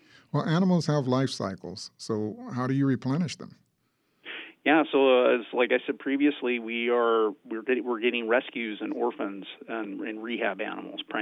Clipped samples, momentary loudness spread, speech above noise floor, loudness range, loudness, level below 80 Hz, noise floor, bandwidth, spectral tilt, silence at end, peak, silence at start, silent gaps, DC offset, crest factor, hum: under 0.1%; 14 LU; 46 dB; 6 LU; -27 LUFS; -76 dBFS; -73 dBFS; 11 kHz; -6.5 dB/octave; 0 s; -8 dBFS; 0.35 s; none; under 0.1%; 18 dB; none